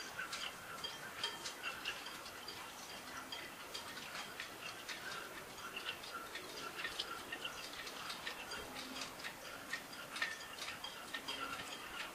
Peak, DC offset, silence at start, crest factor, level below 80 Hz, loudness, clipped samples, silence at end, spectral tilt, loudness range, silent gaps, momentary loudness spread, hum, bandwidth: -24 dBFS; under 0.1%; 0 s; 24 dB; -72 dBFS; -45 LUFS; under 0.1%; 0 s; -1 dB/octave; 2 LU; none; 5 LU; none; 15.5 kHz